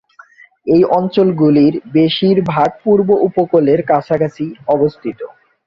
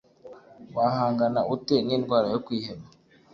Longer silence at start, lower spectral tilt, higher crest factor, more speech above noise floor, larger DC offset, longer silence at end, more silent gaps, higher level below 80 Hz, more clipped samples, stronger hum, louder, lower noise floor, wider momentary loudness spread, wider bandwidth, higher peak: first, 0.65 s vs 0.25 s; first, -9 dB/octave vs -7 dB/octave; second, 12 dB vs 18 dB; first, 31 dB vs 23 dB; neither; about the same, 0.4 s vs 0.5 s; neither; first, -52 dBFS vs -62 dBFS; neither; neither; first, -13 LUFS vs -26 LUFS; second, -44 dBFS vs -48 dBFS; about the same, 12 LU vs 11 LU; about the same, 6.8 kHz vs 7.2 kHz; first, -2 dBFS vs -10 dBFS